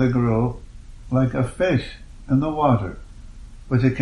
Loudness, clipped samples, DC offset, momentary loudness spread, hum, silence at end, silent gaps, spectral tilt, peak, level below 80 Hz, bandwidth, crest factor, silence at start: -22 LUFS; under 0.1%; under 0.1%; 17 LU; none; 0 s; none; -8.5 dB/octave; -4 dBFS; -38 dBFS; 11 kHz; 16 dB; 0 s